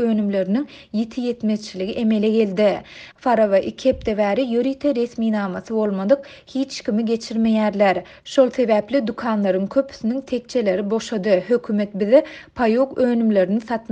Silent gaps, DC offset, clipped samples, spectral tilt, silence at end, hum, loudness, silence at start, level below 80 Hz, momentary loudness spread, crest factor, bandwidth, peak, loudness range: none; under 0.1%; under 0.1%; -6.5 dB/octave; 0.1 s; none; -20 LUFS; 0 s; -52 dBFS; 8 LU; 18 dB; 8.6 kHz; -2 dBFS; 2 LU